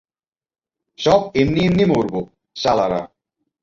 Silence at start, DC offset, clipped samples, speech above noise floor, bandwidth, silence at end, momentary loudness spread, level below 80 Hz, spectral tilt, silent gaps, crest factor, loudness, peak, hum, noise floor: 1 s; under 0.1%; under 0.1%; over 73 dB; 7.6 kHz; 0.55 s; 12 LU; -46 dBFS; -6.5 dB/octave; none; 18 dB; -18 LUFS; -2 dBFS; none; under -90 dBFS